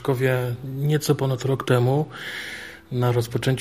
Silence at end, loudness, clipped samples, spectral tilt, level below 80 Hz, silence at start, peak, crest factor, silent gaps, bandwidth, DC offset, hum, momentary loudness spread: 0 s; -23 LUFS; under 0.1%; -6.5 dB/octave; -54 dBFS; 0 s; -6 dBFS; 18 dB; none; 15.5 kHz; 0.1%; none; 11 LU